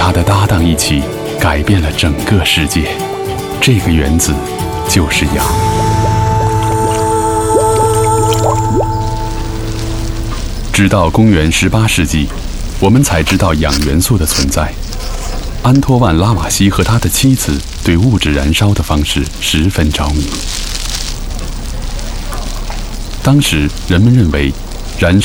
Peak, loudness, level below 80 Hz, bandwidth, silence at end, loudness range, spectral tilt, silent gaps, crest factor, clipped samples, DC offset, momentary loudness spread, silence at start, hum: 0 dBFS; -12 LUFS; -20 dBFS; over 20 kHz; 0 s; 4 LU; -5 dB/octave; none; 12 dB; under 0.1%; under 0.1%; 12 LU; 0 s; none